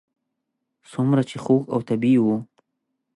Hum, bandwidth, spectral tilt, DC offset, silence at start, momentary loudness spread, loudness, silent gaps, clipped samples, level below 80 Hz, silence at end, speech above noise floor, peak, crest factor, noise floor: none; 11 kHz; -8.5 dB/octave; under 0.1%; 0.9 s; 8 LU; -21 LUFS; none; under 0.1%; -68 dBFS; 0.7 s; 59 dB; -6 dBFS; 16 dB; -79 dBFS